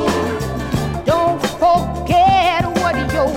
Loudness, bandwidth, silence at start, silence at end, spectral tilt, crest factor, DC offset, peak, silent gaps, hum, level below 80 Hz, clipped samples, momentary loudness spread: -16 LUFS; 16.5 kHz; 0 s; 0 s; -5.5 dB/octave; 14 dB; under 0.1%; -2 dBFS; none; none; -32 dBFS; under 0.1%; 8 LU